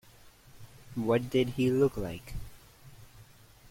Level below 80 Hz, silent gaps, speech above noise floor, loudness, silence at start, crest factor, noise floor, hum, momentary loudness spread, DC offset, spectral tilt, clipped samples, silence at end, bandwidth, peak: -50 dBFS; none; 27 dB; -30 LUFS; 0.25 s; 18 dB; -56 dBFS; none; 19 LU; under 0.1%; -7 dB/octave; under 0.1%; 0 s; 16.5 kHz; -16 dBFS